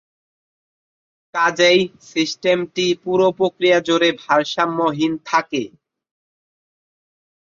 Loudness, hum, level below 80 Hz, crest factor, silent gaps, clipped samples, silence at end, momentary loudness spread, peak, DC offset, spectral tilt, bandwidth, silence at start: -18 LUFS; none; -64 dBFS; 18 dB; none; under 0.1%; 1.9 s; 8 LU; -2 dBFS; under 0.1%; -4 dB/octave; 7.6 kHz; 1.35 s